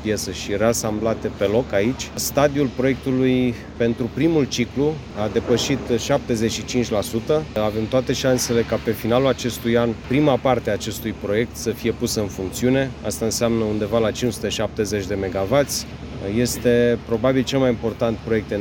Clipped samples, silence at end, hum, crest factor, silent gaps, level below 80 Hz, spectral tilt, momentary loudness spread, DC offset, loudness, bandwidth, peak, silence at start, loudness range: under 0.1%; 0 s; none; 18 dB; none; -40 dBFS; -5 dB/octave; 5 LU; under 0.1%; -21 LUFS; 17 kHz; -2 dBFS; 0 s; 2 LU